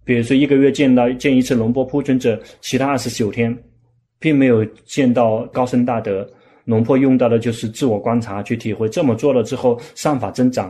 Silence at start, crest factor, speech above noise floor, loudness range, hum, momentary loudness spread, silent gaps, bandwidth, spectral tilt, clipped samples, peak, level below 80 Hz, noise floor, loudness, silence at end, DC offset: 0.05 s; 14 dB; 40 dB; 2 LU; none; 9 LU; none; 13.5 kHz; -6.5 dB/octave; under 0.1%; -2 dBFS; -52 dBFS; -56 dBFS; -17 LUFS; 0 s; under 0.1%